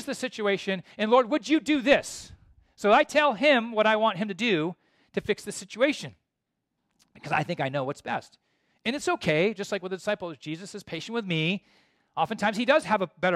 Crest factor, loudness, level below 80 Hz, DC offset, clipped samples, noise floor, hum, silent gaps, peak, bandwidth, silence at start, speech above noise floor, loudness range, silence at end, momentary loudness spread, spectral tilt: 20 dB; -26 LUFS; -64 dBFS; under 0.1%; under 0.1%; -82 dBFS; none; none; -8 dBFS; 14 kHz; 0 s; 56 dB; 8 LU; 0 s; 14 LU; -4.5 dB/octave